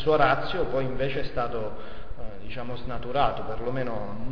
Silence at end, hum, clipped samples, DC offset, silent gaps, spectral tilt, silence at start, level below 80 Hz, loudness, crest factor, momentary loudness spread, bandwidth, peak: 0 s; none; under 0.1%; 4%; none; -7.5 dB/octave; 0 s; -42 dBFS; -29 LUFS; 20 dB; 18 LU; 5.4 kHz; -8 dBFS